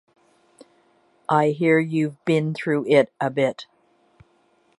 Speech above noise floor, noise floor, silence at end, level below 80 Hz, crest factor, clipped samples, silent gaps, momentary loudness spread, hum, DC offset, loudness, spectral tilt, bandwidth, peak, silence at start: 42 dB; -62 dBFS; 1.15 s; -72 dBFS; 18 dB; under 0.1%; none; 6 LU; none; under 0.1%; -21 LUFS; -7 dB/octave; 11.5 kHz; -4 dBFS; 1.3 s